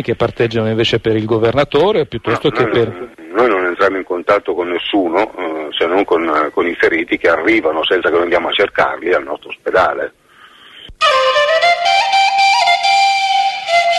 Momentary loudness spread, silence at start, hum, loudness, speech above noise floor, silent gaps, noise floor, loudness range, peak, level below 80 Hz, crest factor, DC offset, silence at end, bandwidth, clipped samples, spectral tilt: 7 LU; 0 s; none; -14 LUFS; 28 dB; none; -43 dBFS; 4 LU; 0 dBFS; -46 dBFS; 14 dB; under 0.1%; 0 s; 12.5 kHz; under 0.1%; -4.5 dB/octave